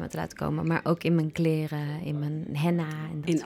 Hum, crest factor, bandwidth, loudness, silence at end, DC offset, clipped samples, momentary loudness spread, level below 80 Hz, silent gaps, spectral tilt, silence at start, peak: none; 16 dB; 15 kHz; -29 LUFS; 0 s; under 0.1%; under 0.1%; 7 LU; -58 dBFS; none; -7.5 dB/octave; 0 s; -12 dBFS